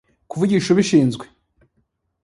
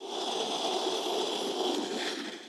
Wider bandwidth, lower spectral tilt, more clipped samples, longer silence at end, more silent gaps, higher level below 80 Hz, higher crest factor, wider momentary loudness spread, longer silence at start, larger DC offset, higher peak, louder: second, 11.5 kHz vs 16.5 kHz; first, -6 dB/octave vs -1.5 dB/octave; neither; first, 1 s vs 0 s; neither; first, -58 dBFS vs under -90 dBFS; about the same, 18 dB vs 14 dB; first, 17 LU vs 3 LU; first, 0.3 s vs 0 s; neither; first, -4 dBFS vs -18 dBFS; first, -18 LUFS vs -32 LUFS